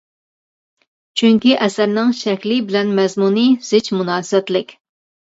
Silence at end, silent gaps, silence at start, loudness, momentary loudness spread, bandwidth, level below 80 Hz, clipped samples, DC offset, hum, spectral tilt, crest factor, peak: 0.55 s; none; 1.15 s; -16 LUFS; 7 LU; 8 kHz; -66 dBFS; under 0.1%; under 0.1%; none; -5 dB/octave; 16 dB; -2 dBFS